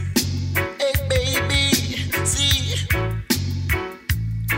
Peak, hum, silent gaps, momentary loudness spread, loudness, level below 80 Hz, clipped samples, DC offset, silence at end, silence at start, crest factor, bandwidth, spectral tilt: -4 dBFS; none; none; 7 LU; -21 LUFS; -32 dBFS; under 0.1%; under 0.1%; 0 s; 0 s; 18 dB; 16.5 kHz; -3.5 dB/octave